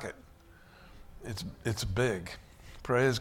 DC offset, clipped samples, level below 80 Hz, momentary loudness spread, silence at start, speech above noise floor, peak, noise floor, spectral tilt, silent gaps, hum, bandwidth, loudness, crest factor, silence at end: under 0.1%; under 0.1%; -50 dBFS; 24 LU; 0 s; 25 dB; -16 dBFS; -56 dBFS; -5 dB/octave; none; none; 17 kHz; -33 LUFS; 18 dB; 0 s